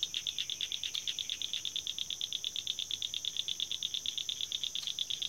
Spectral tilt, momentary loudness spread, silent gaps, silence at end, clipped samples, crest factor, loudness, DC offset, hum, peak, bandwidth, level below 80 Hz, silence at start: 2 dB/octave; 1 LU; none; 0 s; under 0.1%; 20 dB; -35 LUFS; under 0.1%; none; -18 dBFS; 17 kHz; -70 dBFS; 0 s